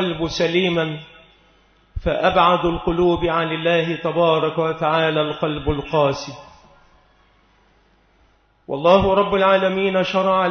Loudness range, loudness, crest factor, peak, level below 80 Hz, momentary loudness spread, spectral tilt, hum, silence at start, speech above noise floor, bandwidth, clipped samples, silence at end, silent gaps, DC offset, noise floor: 7 LU; -19 LUFS; 18 dB; -2 dBFS; -40 dBFS; 9 LU; -6 dB/octave; none; 0 s; 39 dB; 6.6 kHz; under 0.1%; 0 s; none; under 0.1%; -58 dBFS